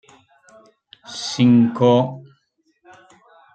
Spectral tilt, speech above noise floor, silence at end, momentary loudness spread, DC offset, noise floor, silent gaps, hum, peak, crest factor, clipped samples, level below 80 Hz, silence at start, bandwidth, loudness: -6.5 dB/octave; 50 dB; 1.35 s; 18 LU; under 0.1%; -66 dBFS; none; none; -4 dBFS; 18 dB; under 0.1%; -66 dBFS; 1.1 s; 9 kHz; -17 LUFS